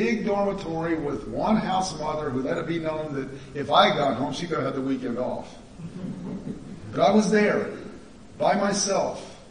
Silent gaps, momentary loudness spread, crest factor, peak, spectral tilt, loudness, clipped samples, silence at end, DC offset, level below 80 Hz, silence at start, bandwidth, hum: none; 16 LU; 22 dB; -4 dBFS; -4.5 dB/octave; -25 LUFS; under 0.1%; 0 s; 0.2%; -52 dBFS; 0 s; 10.5 kHz; none